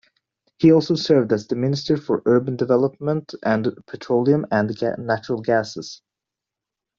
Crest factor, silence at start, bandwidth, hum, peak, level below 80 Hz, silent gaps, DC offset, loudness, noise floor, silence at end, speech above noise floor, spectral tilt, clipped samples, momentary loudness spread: 18 dB; 0.6 s; 7.4 kHz; none; -4 dBFS; -60 dBFS; none; under 0.1%; -20 LUFS; -86 dBFS; 1.05 s; 66 dB; -7 dB/octave; under 0.1%; 8 LU